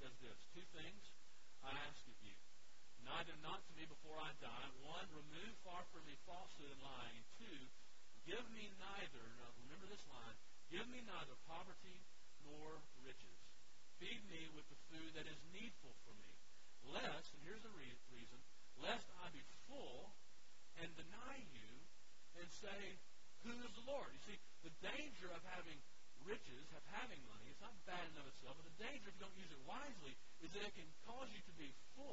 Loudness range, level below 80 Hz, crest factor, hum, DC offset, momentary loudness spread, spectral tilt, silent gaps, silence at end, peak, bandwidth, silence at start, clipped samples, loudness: 4 LU; -74 dBFS; 24 dB; none; 0.4%; 14 LU; -2 dB/octave; none; 0 s; -32 dBFS; 7.6 kHz; 0 s; under 0.1%; -56 LUFS